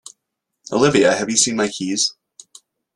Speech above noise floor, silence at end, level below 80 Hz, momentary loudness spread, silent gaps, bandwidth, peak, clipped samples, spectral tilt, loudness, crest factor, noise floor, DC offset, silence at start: 61 dB; 0.85 s; -58 dBFS; 7 LU; none; 12.5 kHz; 0 dBFS; under 0.1%; -3 dB/octave; -17 LUFS; 20 dB; -78 dBFS; under 0.1%; 0.7 s